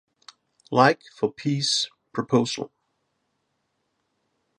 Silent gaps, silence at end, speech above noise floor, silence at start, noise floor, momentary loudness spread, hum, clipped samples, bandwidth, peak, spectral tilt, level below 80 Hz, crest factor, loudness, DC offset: none; 1.95 s; 52 dB; 0.7 s; -75 dBFS; 13 LU; none; under 0.1%; 11.5 kHz; -2 dBFS; -4 dB/octave; -70 dBFS; 24 dB; -24 LUFS; under 0.1%